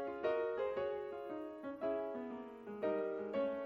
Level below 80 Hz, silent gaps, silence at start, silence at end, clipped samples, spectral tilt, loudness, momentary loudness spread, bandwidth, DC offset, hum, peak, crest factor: -74 dBFS; none; 0 s; 0 s; under 0.1%; -7.5 dB/octave; -41 LUFS; 9 LU; 6.2 kHz; under 0.1%; none; -26 dBFS; 16 dB